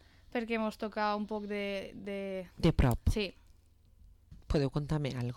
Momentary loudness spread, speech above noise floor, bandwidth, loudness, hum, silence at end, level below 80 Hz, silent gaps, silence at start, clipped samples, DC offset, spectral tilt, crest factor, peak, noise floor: 10 LU; 29 dB; 17.5 kHz; -34 LUFS; none; 0 s; -42 dBFS; none; 0.35 s; under 0.1%; under 0.1%; -7 dB/octave; 16 dB; -18 dBFS; -62 dBFS